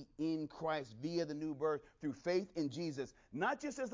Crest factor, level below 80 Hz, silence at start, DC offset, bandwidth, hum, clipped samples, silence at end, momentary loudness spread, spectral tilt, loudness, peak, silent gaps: 16 dB; -74 dBFS; 0 s; under 0.1%; 7.6 kHz; none; under 0.1%; 0 s; 5 LU; -5.5 dB/octave; -40 LUFS; -24 dBFS; none